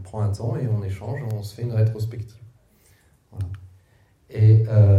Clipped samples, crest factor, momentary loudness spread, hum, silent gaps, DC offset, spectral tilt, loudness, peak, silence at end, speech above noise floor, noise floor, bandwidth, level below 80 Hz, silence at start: under 0.1%; 16 dB; 20 LU; none; none; under 0.1%; -9 dB/octave; -23 LUFS; -6 dBFS; 0 s; 38 dB; -58 dBFS; 5.8 kHz; -54 dBFS; 0 s